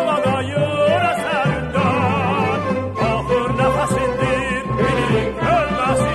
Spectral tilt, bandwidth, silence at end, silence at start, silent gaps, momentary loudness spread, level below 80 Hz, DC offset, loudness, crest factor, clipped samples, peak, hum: -6 dB/octave; 13 kHz; 0 s; 0 s; none; 3 LU; -36 dBFS; under 0.1%; -18 LUFS; 14 dB; under 0.1%; -4 dBFS; none